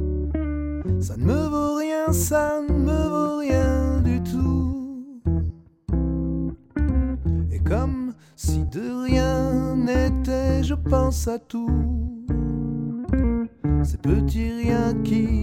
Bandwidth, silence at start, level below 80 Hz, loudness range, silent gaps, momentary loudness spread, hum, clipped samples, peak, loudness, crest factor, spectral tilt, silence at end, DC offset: 16 kHz; 0 s; -28 dBFS; 3 LU; none; 7 LU; none; under 0.1%; -6 dBFS; -24 LUFS; 16 dB; -7 dB/octave; 0 s; under 0.1%